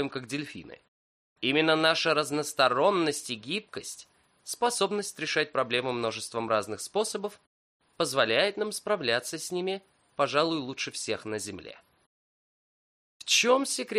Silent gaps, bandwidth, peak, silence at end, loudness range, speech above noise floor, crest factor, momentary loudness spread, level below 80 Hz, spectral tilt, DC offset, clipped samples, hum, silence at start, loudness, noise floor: 0.88-1.36 s, 7.47-7.80 s, 12.06-13.20 s; 14.5 kHz; -10 dBFS; 0 s; 5 LU; over 61 dB; 20 dB; 16 LU; -74 dBFS; -2.5 dB/octave; under 0.1%; under 0.1%; none; 0 s; -28 LUFS; under -90 dBFS